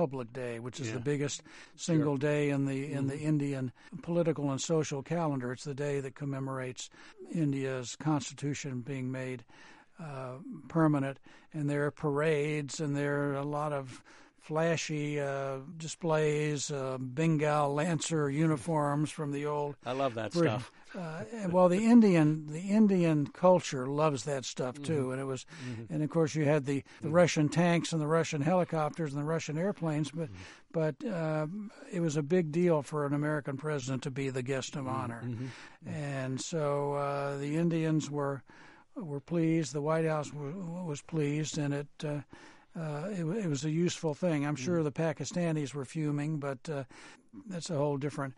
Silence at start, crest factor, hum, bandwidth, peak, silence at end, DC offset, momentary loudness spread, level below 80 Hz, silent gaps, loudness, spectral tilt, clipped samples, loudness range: 0 s; 20 dB; none; 11.5 kHz; -12 dBFS; 0 s; under 0.1%; 12 LU; -70 dBFS; none; -32 LUFS; -6 dB/octave; under 0.1%; 7 LU